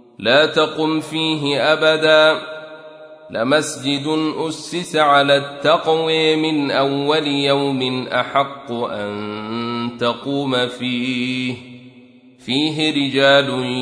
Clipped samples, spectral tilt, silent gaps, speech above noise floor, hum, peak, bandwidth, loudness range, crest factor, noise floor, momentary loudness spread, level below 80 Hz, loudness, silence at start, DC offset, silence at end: under 0.1%; -4.5 dB/octave; none; 28 dB; none; -2 dBFS; 11 kHz; 6 LU; 16 dB; -46 dBFS; 12 LU; -64 dBFS; -17 LUFS; 0.2 s; under 0.1%; 0 s